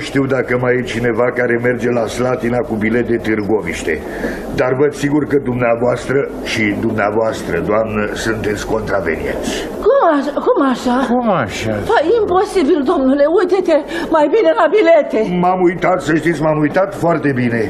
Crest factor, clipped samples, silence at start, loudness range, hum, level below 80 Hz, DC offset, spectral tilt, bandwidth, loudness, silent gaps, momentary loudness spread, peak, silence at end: 14 dB; under 0.1%; 0 s; 4 LU; none; -38 dBFS; under 0.1%; -6 dB/octave; 13.5 kHz; -15 LUFS; none; 7 LU; 0 dBFS; 0 s